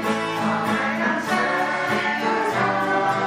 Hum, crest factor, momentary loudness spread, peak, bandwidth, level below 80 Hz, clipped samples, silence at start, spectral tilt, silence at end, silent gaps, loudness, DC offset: none; 12 dB; 2 LU; -10 dBFS; 16 kHz; -66 dBFS; under 0.1%; 0 s; -4.5 dB/octave; 0 s; none; -22 LUFS; under 0.1%